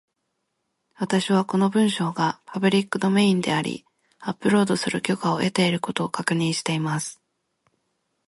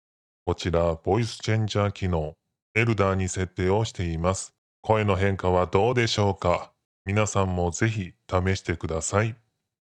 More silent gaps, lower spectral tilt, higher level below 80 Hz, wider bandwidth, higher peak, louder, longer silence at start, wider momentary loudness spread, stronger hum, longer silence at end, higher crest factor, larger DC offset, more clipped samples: second, none vs 2.62-2.75 s, 4.58-4.83 s, 6.85-7.05 s; about the same, -5 dB/octave vs -5.5 dB/octave; second, -66 dBFS vs -50 dBFS; first, 11.5 kHz vs 10 kHz; about the same, -4 dBFS vs -4 dBFS; about the same, -23 LUFS vs -25 LUFS; first, 1 s vs 0.45 s; about the same, 9 LU vs 8 LU; neither; first, 1.15 s vs 0.65 s; about the same, 20 dB vs 20 dB; neither; neither